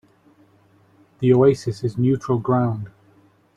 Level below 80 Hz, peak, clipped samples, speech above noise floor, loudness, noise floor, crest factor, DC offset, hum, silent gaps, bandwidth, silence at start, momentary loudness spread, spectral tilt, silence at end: -56 dBFS; -4 dBFS; under 0.1%; 38 dB; -20 LUFS; -56 dBFS; 18 dB; under 0.1%; none; none; 10.5 kHz; 1.2 s; 11 LU; -8.5 dB/octave; 0.65 s